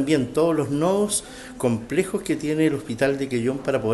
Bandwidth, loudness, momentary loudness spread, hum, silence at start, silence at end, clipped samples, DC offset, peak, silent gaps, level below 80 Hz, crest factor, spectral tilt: 13 kHz; -23 LUFS; 4 LU; none; 0 s; 0 s; under 0.1%; under 0.1%; -8 dBFS; none; -52 dBFS; 16 dB; -5 dB/octave